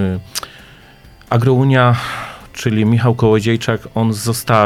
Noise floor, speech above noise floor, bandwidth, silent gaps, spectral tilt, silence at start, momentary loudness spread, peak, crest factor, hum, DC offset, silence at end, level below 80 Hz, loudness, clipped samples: -42 dBFS; 28 dB; 15.5 kHz; none; -6 dB/octave; 0 s; 14 LU; 0 dBFS; 16 dB; none; under 0.1%; 0 s; -44 dBFS; -15 LUFS; under 0.1%